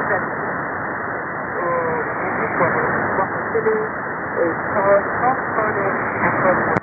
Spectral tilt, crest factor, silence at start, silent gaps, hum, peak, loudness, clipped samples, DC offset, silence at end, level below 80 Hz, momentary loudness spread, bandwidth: -10.5 dB/octave; 20 dB; 0 s; none; none; 0 dBFS; -20 LUFS; under 0.1%; under 0.1%; 0 s; -50 dBFS; 8 LU; 4.2 kHz